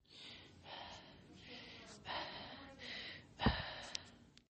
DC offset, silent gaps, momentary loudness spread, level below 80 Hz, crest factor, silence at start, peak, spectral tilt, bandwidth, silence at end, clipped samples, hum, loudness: under 0.1%; none; 18 LU; -56 dBFS; 28 dB; 0.1 s; -20 dBFS; -4.5 dB/octave; 8.4 kHz; 0.1 s; under 0.1%; none; -46 LUFS